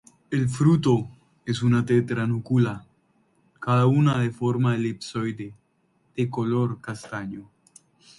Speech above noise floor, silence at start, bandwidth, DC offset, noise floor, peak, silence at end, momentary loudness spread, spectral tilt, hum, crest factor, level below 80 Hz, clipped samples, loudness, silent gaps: 44 dB; 0.3 s; 11.5 kHz; under 0.1%; -67 dBFS; -8 dBFS; 0.75 s; 17 LU; -7.5 dB/octave; none; 18 dB; -60 dBFS; under 0.1%; -24 LUFS; none